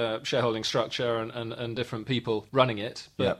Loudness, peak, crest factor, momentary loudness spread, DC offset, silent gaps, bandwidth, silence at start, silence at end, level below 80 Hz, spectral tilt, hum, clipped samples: -29 LUFS; -6 dBFS; 22 dB; 9 LU; under 0.1%; none; 14 kHz; 0 s; 0 s; -64 dBFS; -5 dB/octave; none; under 0.1%